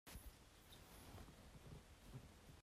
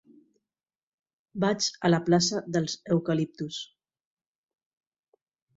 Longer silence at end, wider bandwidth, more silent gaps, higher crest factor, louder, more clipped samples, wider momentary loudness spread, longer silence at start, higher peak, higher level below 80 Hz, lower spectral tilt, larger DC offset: second, 0 s vs 1.9 s; first, 15.5 kHz vs 7.8 kHz; neither; about the same, 16 dB vs 20 dB; second, -62 LUFS vs -27 LUFS; neither; second, 4 LU vs 14 LU; second, 0.05 s vs 1.35 s; second, -46 dBFS vs -10 dBFS; about the same, -66 dBFS vs -68 dBFS; about the same, -4.5 dB/octave vs -5 dB/octave; neither